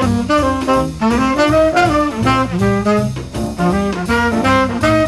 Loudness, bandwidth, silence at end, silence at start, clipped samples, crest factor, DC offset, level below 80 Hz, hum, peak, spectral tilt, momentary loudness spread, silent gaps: -15 LUFS; 14 kHz; 0 s; 0 s; under 0.1%; 14 dB; 0.3%; -32 dBFS; none; -2 dBFS; -6 dB/octave; 5 LU; none